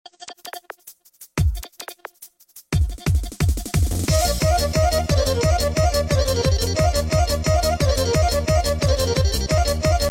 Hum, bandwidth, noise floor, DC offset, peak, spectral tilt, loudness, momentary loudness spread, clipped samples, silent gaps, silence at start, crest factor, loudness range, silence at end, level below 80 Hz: none; 17 kHz; -48 dBFS; under 0.1%; -8 dBFS; -4.5 dB/octave; -20 LUFS; 17 LU; under 0.1%; none; 0.2 s; 12 dB; 6 LU; 0 s; -26 dBFS